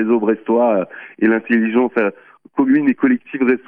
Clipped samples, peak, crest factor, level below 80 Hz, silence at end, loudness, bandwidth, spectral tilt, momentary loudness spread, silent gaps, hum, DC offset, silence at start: under 0.1%; -4 dBFS; 12 dB; -62 dBFS; 0.1 s; -17 LUFS; 3.6 kHz; -9.5 dB/octave; 6 LU; none; none; under 0.1%; 0 s